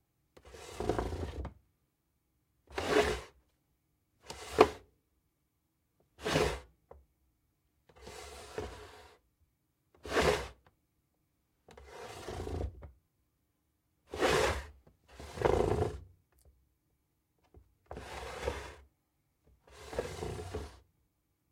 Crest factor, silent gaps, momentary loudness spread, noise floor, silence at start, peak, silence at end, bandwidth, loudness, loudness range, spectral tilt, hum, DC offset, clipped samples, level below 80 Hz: 34 dB; none; 22 LU; -80 dBFS; 0.45 s; -4 dBFS; 0.75 s; 16.5 kHz; -35 LUFS; 13 LU; -4.5 dB/octave; none; under 0.1%; under 0.1%; -52 dBFS